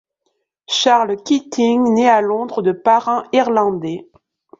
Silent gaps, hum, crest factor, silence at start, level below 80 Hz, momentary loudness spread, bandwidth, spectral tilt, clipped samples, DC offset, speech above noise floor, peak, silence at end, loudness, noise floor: none; none; 14 dB; 0.7 s; -64 dBFS; 7 LU; 7.8 kHz; -4 dB/octave; under 0.1%; under 0.1%; 55 dB; -2 dBFS; 0.55 s; -16 LUFS; -70 dBFS